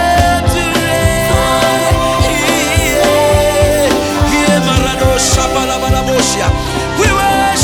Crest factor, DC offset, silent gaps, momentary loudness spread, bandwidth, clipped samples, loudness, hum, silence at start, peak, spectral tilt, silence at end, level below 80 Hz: 12 dB; under 0.1%; none; 3 LU; 19.5 kHz; under 0.1%; -11 LUFS; none; 0 s; 0 dBFS; -4 dB/octave; 0 s; -22 dBFS